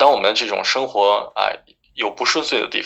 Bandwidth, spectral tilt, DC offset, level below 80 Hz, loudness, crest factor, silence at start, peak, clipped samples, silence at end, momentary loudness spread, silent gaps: 8.2 kHz; -1 dB/octave; under 0.1%; -62 dBFS; -18 LUFS; 18 dB; 0 s; 0 dBFS; under 0.1%; 0 s; 8 LU; none